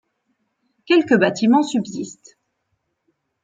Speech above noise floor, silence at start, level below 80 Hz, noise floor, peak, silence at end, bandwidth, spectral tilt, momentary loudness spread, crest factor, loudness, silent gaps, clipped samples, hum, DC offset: 55 dB; 0.9 s; -68 dBFS; -73 dBFS; -2 dBFS; 1.3 s; 9 kHz; -5 dB/octave; 15 LU; 18 dB; -18 LUFS; none; under 0.1%; none; under 0.1%